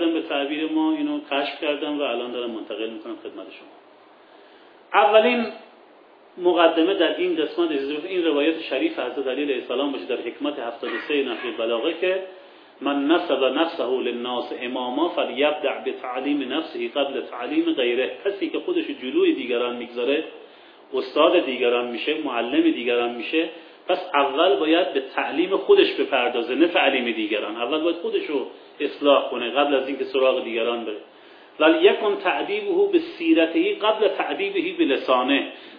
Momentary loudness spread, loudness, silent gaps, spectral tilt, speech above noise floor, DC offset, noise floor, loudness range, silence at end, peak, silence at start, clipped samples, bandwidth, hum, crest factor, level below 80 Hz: 10 LU; -22 LUFS; none; -6.5 dB/octave; 29 dB; under 0.1%; -51 dBFS; 5 LU; 0 s; -2 dBFS; 0 s; under 0.1%; 5.2 kHz; none; 20 dB; -78 dBFS